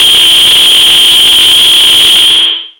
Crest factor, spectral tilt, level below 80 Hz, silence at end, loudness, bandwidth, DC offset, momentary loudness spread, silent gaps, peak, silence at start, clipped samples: 4 dB; 1.5 dB/octave; -40 dBFS; 0.1 s; -1 LUFS; over 20 kHz; under 0.1%; 1 LU; none; 0 dBFS; 0 s; 0.6%